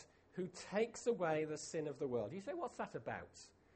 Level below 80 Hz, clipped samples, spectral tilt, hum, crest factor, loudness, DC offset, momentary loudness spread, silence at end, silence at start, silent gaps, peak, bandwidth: -76 dBFS; under 0.1%; -5 dB/octave; none; 18 dB; -43 LUFS; under 0.1%; 10 LU; 0.25 s; 0 s; none; -26 dBFS; 8.4 kHz